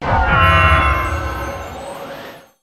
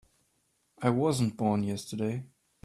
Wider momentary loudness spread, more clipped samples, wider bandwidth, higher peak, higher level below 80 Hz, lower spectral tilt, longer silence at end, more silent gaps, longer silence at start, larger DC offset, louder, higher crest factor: first, 20 LU vs 7 LU; neither; about the same, 13.5 kHz vs 13.5 kHz; first, 0 dBFS vs -12 dBFS; first, -24 dBFS vs -64 dBFS; about the same, -5.5 dB/octave vs -6.5 dB/octave; second, 0.2 s vs 0.4 s; neither; second, 0 s vs 0.8 s; neither; first, -14 LUFS vs -30 LUFS; about the same, 16 dB vs 20 dB